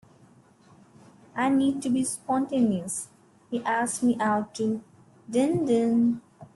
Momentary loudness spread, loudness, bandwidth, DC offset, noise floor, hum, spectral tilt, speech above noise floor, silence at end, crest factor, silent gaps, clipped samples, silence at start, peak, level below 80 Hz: 11 LU; -26 LUFS; 12.5 kHz; under 0.1%; -57 dBFS; none; -5 dB/octave; 32 dB; 0.1 s; 16 dB; none; under 0.1%; 1.35 s; -12 dBFS; -66 dBFS